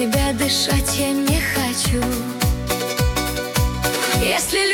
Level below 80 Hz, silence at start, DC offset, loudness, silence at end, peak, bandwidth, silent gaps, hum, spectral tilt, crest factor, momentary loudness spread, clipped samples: -28 dBFS; 0 s; under 0.1%; -19 LUFS; 0 s; -4 dBFS; 18 kHz; none; none; -3.5 dB/octave; 14 dB; 4 LU; under 0.1%